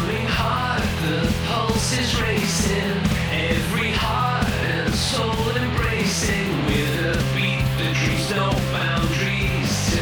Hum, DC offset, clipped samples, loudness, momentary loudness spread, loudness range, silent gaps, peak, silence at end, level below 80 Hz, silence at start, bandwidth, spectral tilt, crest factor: none; under 0.1%; under 0.1%; -21 LUFS; 1 LU; 0 LU; none; -8 dBFS; 0 s; -32 dBFS; 0 s; over 20 kHz; -4.5 dB/octave; 14 dB